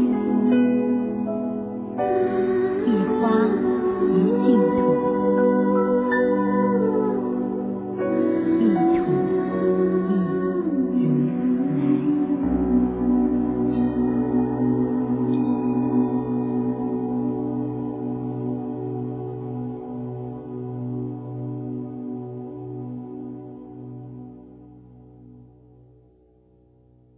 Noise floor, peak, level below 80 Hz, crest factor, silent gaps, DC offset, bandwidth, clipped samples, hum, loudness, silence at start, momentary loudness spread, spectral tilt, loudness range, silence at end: -56 dBFS; -6 dBFS; -48 dBFS; 16 dB; none; under 0.1%; 4 kHz; under 0.1%; none; -22 LUFS; 0 s; 14 LU; -12.5 dB/octave; 14 LU; 1.75 s